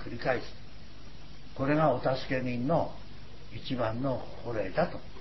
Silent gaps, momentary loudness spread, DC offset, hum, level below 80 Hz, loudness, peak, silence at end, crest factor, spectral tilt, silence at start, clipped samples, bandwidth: none; 23 LU; 1%; none; -52 dBFS; -31 LUFS; -12 dBFS; 0 s; 20 dB; -8 dB/octave; 0 s; under 0.1%; 6 kHz